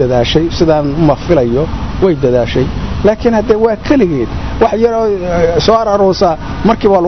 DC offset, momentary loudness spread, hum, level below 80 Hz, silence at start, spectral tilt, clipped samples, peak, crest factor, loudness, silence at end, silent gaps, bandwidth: 3%; 4 LU; none; -24 dBFS; 0 s; -7 dB/octave; under 0.1%; 0 dBFS; 10 dB; -11 LUFS; 0 s; none; 6.4 kHz